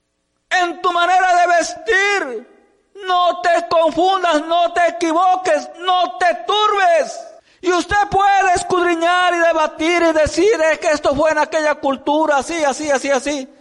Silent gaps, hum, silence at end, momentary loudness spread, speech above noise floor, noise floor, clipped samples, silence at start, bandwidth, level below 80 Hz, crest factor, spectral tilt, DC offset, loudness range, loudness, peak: none; none; 0.15 s; 5 LU; 53 dB; -68 dBFS; under 0.1%; 0.5 s; 11.5 kHz; -46 dBFS; 10 dB; -3 dB/octave; under 0.1%; 2 LU; -16 LUFS; -6 dBFS